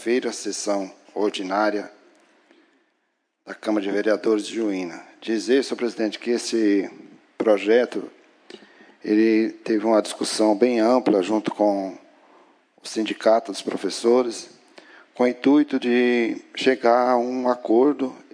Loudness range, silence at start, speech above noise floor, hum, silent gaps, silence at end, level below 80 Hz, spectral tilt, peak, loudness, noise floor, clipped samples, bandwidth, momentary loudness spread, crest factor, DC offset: 6 LU; 0 s; 52 dB; none; none; 0.2 s; -86 dBFS; -4 dB/octave; -4 dBFS; -22 LUFS; -73 dBFS; under 0.1%; 10.5 kHz; 13 LU; 18 dB; under 0.1%